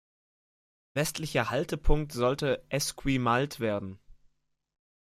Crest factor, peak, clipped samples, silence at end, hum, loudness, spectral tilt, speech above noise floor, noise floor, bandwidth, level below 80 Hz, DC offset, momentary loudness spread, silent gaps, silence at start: 22 dB; -8 dBFS; under 0.1%; 0.95 s; none; -30 LUFS; -5 dB/octave; 39 dB; -67 dBFS; 16 kHz; -38 dBFS; under 0.1%; 5 LU; none; 0.95 s